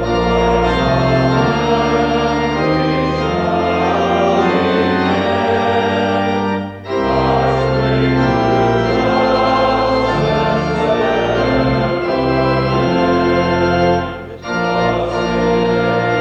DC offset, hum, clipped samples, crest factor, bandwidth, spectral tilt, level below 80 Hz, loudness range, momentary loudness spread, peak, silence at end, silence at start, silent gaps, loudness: under 0.1%; none; under 0.1%; 12 dB; 8.8 kHz; -7 dB/octave; -32 dBFS; 1 LU; 3 LU; -4 dBFS; 0 s; 0 s; none; -15 LUFS